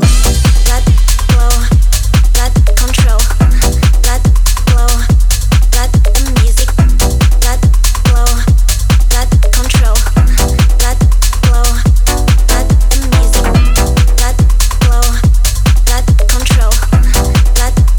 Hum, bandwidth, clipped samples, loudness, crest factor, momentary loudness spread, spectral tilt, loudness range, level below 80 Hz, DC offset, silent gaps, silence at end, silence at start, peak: none; 19.5 kHz; under 0.1%; -11 LUFS; 8 dB; 1 LU; -4.5 dB/octave; 0 LU; -8 dBFS; under 0.1%; none; 0 s; 0 s; 0 dBFS